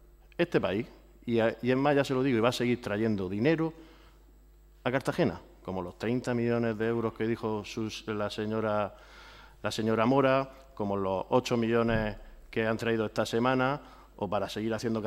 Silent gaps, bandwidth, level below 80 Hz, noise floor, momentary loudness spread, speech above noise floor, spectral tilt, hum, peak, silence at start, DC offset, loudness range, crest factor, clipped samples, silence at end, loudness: none; 15 kHz; -54 dBFS; -57 dBFS; 11 LU; 27 dB; -6.5 dB/octave; none; -10 dBFS; 0.4 s; under 0.1%; 4 LU; 20 dB; under 0.1%; 0 s; -30 LUFS